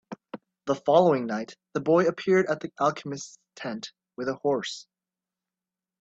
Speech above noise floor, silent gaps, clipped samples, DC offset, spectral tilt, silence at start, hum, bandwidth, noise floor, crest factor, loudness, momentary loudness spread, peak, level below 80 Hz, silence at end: over 64 dB; none; under 0.1%; under 0.1%; -5.5 dB/octave; 0.1 s; none; 8 kHz; under -90 dBFS; 22 dB; -26 LUFS; 20 LU; -6 dBFS; -72 dBFS; 1.2 s